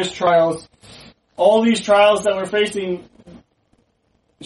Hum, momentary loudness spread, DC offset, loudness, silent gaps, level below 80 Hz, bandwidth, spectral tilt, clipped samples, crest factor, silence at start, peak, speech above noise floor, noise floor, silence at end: none; 13 LU; under 0.1%; -16 LUFS; none; -58 dBFS; 11.5 kHz; -4.5 dB/octave; under 0.1%; 16 dB; 0 s; -2 dBFS; 47 dB; -64 dBFS; 0 s